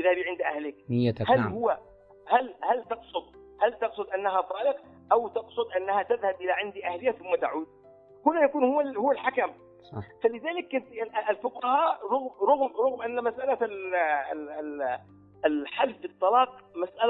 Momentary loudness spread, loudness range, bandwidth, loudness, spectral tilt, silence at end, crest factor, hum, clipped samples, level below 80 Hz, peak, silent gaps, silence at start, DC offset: 10 LU; 2 LU; 4.8 kHz; -28 LUFS; -9.5 dB/octave; 0 s; 20 dB; none; under 0.1%; -68 dBFS; -8 dBFS; none; 0 s; under 0.1%